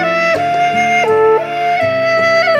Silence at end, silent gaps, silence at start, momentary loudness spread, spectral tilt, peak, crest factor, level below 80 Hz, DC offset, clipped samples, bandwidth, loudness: 0 s; none; 0 s; 3 LU; -4 dB/octave; -2 dBFS; 10 dB; -58 dBFS; under 0.1%; under 0.1%; 12.5 kHz; -12 LUFS